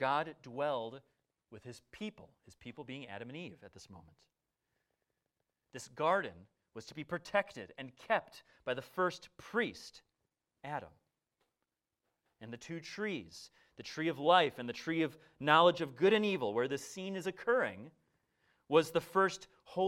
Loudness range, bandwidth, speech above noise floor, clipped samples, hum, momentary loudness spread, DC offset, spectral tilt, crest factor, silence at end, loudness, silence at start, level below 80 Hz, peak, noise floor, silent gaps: 18 LU; 16 kHz; 53 dB; under 0.1%; none; 23 LU; under 0.1%; -4.5 dB/octave; 26 dB; 0 s; -35 LUFS; 0 s; -76 dBFS; -12 dBFS; -89 dBFS; none